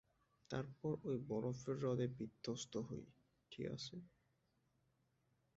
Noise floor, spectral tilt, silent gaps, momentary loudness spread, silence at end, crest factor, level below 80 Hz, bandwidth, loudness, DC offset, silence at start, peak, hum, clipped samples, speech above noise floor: -82 dBFS; -6.5 dB/octave; none; 11 LU; 1.5 s; 20 dB; -76 dBFS; 7.6 kHz; -46 LUFS; under 0.1%; 0.5 s; -28 dBFS; none; under 0.1%; 37 dB